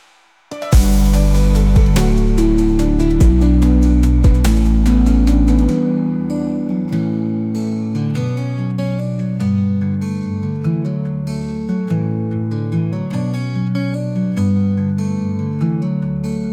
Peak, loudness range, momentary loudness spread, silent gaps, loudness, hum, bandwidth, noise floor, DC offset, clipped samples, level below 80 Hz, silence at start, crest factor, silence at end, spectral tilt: -2 dBFS; 7 LU; 8 LU; none; -17 LUFS; none; 15 kHz; -51 dBFS; 0.1%; under 0.1%; -18 dBFS; 0.5 s; 14 dB; 0 s; -7.5 dB/octave